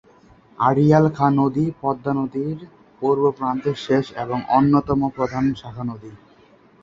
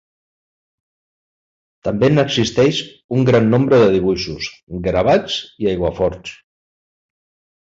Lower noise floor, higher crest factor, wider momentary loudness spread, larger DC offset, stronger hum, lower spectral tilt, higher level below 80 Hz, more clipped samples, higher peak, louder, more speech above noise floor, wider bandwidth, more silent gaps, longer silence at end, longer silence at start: second, -52 dBFS vs under -90 dBFS; about the same, 18 dB vs 16 dB; about the same, 13 LU vs 13 LU; neither; neither; first, -8.5 dB/octave vs -6 dB/octave; second, -50 dBFS vs -42 dBFS; neither; about the same, -2 dBFS vs -2 dBFS; second, -20 LUFS vs -16 LUFS; second, 33 dB vs over 74 dB; about the same, 7.4 kHz vs 7.8 kHz; second, none vs 3.04-3.09 s, 4.63-4.67 s; second, 0.65 s vs 1.4 s; second, 0.6 s vs 1.85 s